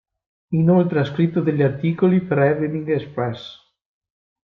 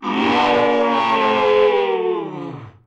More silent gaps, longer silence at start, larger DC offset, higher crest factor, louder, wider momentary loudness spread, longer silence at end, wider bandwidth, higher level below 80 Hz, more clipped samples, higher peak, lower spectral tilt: neither; first, 0.5 s vs 0 s; neither; about the same, 16 dB vs 12 dB; second, -20 LUFS vs -17 LUFS; second, 9 LU vs 13 LU; first, 0.9 s vs 0.15 s; second, 5.8 kHz vs 8.4 kHz; about the same, -58 dBFS vs -58 dBFS; neither; about the same, -4 dBFS vs -6 dBFS; first, -10 dB/octave vs -5.5 dB/octave